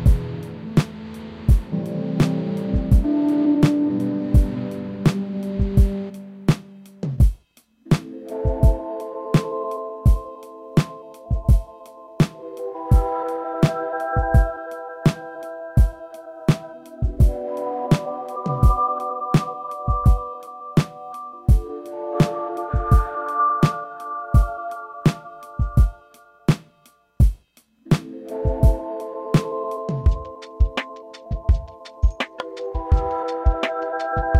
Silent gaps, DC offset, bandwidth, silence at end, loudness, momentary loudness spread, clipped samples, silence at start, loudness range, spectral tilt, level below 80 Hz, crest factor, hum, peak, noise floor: none; under 0.1%; 13.5 kHz; 0 s; -22 LUFS; 13 LU; under 0.1%; 0 s; 4 LU; -7.5 dB/octave; -24 dBFS; 16 dB; none; -4 dBFS; -57 dBFS